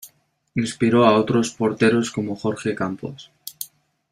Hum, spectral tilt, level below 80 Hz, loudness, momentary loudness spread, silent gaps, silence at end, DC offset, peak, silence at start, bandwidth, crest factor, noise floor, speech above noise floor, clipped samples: none; -5.5 dB/octave; -58 dBFS; -20 LUFS; 19 LU; none; 0.45 s; under 0.1%; -2 dBFS; 0.05 s; 16 kHz; 18 dB; -59 dBFS; 39 dB; under 0.1%